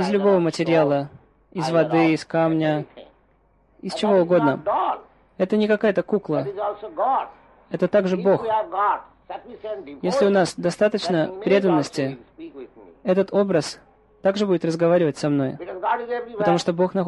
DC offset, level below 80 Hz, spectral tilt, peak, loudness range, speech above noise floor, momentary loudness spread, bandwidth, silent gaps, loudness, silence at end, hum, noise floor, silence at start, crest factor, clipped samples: under 0.1%; -62 dBFS; -6.5 dB/octave; -6 dBFS; 2 LU; 39 dB; 15 LU; 11.5 kHz; none; -21 LUFS; 0 s; none; -60 dBFS; 0 s; 16 dB; under 0.1%